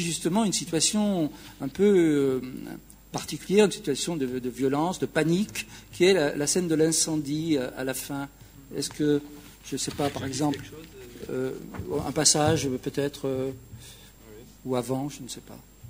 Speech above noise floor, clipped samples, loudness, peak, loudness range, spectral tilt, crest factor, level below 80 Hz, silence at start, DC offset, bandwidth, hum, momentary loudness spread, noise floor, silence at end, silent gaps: 22 dB; under 0.1%; -26 LUFS; -4 dBFS; 6 LU; -4 dB/octave; 22 dB; -54 dBFS; 0 s; under 0.1%; 16 kHz; none; 18 LU; -48 dBFS; 0 s; none